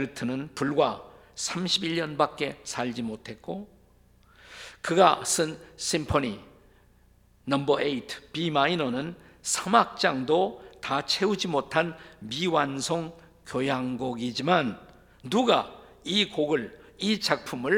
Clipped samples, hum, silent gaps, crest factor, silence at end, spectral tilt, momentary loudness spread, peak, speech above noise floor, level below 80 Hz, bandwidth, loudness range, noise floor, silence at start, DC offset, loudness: under 0.1%; none; none; 24 dB; 0 s; -3.5 dB/octave; 16 LU; -4 dBFS; 33 dB; -58 dBFS; 18 kHz; 3 LU; -60 dBFS; 0 s; under 0.1%; -27 LUFS